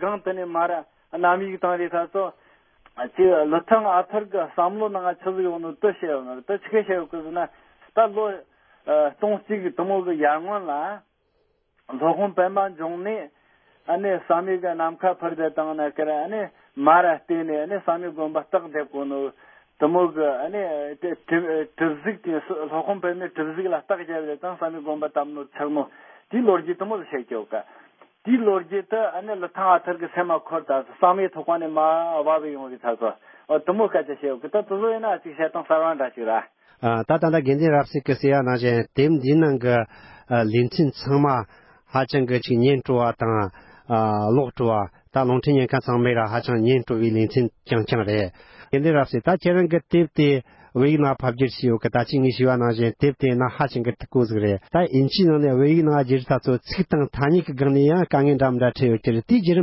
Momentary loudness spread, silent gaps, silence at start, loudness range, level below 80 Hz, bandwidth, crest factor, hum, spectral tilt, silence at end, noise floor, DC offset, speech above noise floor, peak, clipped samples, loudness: 10 LU; none; 0 s; 6 LU; -54 dBFS; 5.8 kHz; 20 dB; none; -11.5 dB/octave; 0 s; -68 dBFS; under 0.1%; 46 dB; -2 dBFS; under 0.1%; -22 LUFS